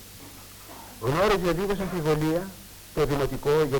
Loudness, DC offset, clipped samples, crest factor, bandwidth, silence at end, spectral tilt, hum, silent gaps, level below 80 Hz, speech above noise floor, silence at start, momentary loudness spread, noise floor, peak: -26 LUFS; under 0.1%; under 0.1%; 16 dB; 19 kHz; 0 s; -6 dB/octave; none; none; -42 dBFS; 20 dB; 0 s; 20 LU; -45 dBFS; -10 dBFS